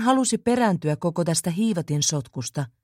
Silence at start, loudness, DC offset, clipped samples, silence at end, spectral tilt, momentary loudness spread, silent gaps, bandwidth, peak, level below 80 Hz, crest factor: 0 s; -23 LUFS; under 0.1%; under 0.1%; 0.15 s; -4.5 dB/octave; 8 LU; none; 16.5 kHz; -8 dBFS; -60 dBFS; 16 dB